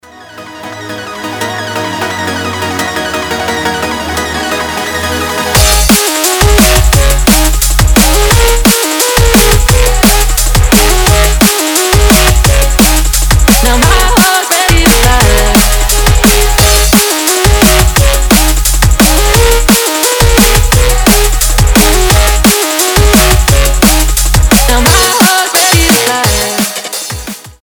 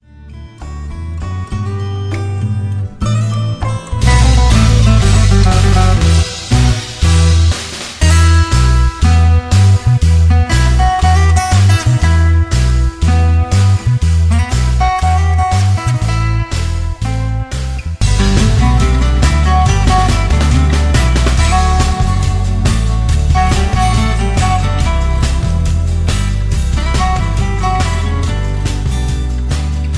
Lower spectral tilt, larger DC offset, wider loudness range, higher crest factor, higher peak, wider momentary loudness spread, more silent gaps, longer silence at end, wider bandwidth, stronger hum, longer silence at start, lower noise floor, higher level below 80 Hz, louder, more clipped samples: second, -3.5 dB/octave vs -5.5 dB/octave; neither; about the same, 7 LU vs 5 LU; about the same, 8 dB vs 10 dB; about the same, 0 dBFS vs 0 dBFS; about the same, 9 LU vs 9 LU; neither; about the same, 0.1 s vs 0 s; first, over 20 kHz vs 11 kHz; neither; about the same, 0.2 s vs 0.2 s; about the same, -30 dBFS vs -32 dBFS; about the same, -12 dBFS vs -14 dBFS; first, -7 LUFS vs -13 LUFS; first, 1% vs under 0.1%